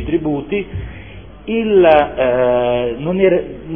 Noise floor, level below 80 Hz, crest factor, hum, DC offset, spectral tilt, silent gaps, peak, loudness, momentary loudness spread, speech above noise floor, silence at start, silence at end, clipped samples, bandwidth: -35 dBFS; -36 dBFS; 16 dB; none; 0.5%; -10 dB/octave; none; 0 dBFS; -15 LUFS; 18 LU; 20 dB; 0 s; 0 s; under 0.1%; 3.6 kHz